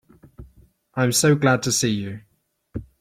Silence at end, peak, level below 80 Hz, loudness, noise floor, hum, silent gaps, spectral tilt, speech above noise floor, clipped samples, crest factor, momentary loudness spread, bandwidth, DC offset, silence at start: 0.2 s; -6 dBFS; -50 dBFS; -20 LUFS; -55 dBFS; none; none; -4 dB/octave; 35 dB; under 0.1%; 18 dB; 20 LU; 16.5 kHz; under 0.1%; 0.4 s